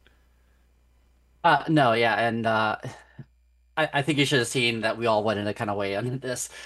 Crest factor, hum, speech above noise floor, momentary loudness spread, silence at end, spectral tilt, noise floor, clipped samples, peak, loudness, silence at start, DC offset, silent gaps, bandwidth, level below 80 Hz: 20 dB; none; 37 dB; 10 LU; 0 s; -4.5 dB/octave; -62 dBFS; under 0.1%; -6 dBFS; -24 LUFS; 1.45 s; under 0.1%; none; 12.5 kHz; -60 dBFS